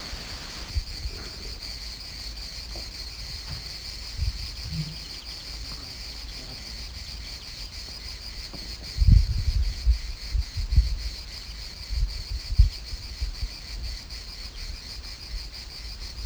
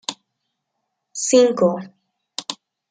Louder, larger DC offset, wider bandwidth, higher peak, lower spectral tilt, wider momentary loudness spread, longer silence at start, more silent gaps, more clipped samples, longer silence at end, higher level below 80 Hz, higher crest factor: second, -32 LUFS vs -18 LUFS; neither; first, over 20 kHz vs 9.6 kHz; second, -6 dBFS vs -2 dBFS; about the same, -4 dB/octave vs -3.5 dB/octave; second, 11 LU vs 19 LU; about the same, 0 s vs 0.1 s; neither; neither; second, 0 s vs 0.35 s; first, -30 dBFS vs -70 dBFS; about the same, 24 dB vs 20 dB